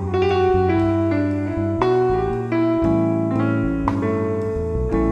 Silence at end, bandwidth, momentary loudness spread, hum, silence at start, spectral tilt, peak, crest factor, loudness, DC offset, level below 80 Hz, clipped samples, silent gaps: 0 s; 8.4 kHz; 5 LU; none; 0 s; -9 dB/octave; -4 dBFS; 16 dB; -20 LUFS; under 0.1%; -34 dBFS; under 0.1%; none